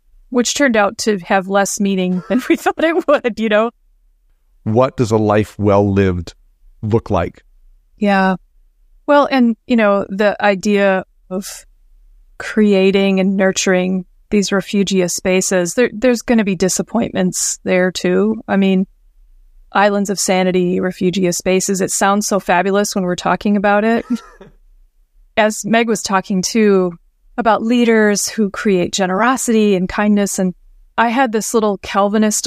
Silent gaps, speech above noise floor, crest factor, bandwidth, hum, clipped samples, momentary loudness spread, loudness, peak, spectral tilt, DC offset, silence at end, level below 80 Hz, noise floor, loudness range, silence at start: none; 40 dB; 16 dB; 15.5 kHz; none; under 0.1%; 7 LU; -15 LUFS; 0 dBFS; -4.5 dB/octave; under 0.1%; 0 s; -46 dBFS; -54 dBFS; 2 LU; 0.3 s